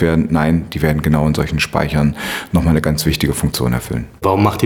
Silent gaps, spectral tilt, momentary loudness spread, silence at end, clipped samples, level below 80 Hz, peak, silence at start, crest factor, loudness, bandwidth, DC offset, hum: none; -6 dB/octave; 4 LU; 0 s; under 0.1%; -28 dBFS; 0 dBFS; 0 s; 14 dB; -16 LUFS; 19 kHz; under 0.1%; none